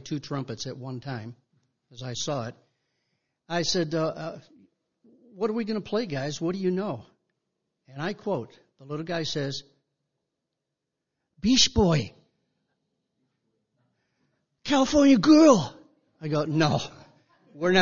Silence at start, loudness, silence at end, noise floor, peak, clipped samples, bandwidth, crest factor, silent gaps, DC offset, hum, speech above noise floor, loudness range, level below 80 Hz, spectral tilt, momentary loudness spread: 0.05 s; -25 LUFS; 0 s; -84 dBFS; -6 dBFS; under 0.1%; 7.4 kHz; 22 dB; none; under 0.1%; none; 60 dB; 12 LU; -52 dBFS; -5 dB/octave; 19 LU